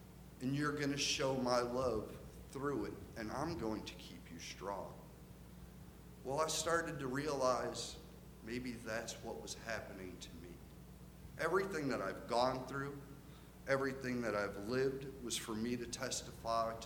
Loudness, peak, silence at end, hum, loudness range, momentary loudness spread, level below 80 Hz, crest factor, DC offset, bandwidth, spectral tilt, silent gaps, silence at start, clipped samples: -40 LUFS; -20 dBFS; 0 s; none; 7 LU; 20 LU; -60 dBFS; 22 dB; under 0.1%; over 20 kHz; -4 dB/octave; none; 0 s; under 0.1%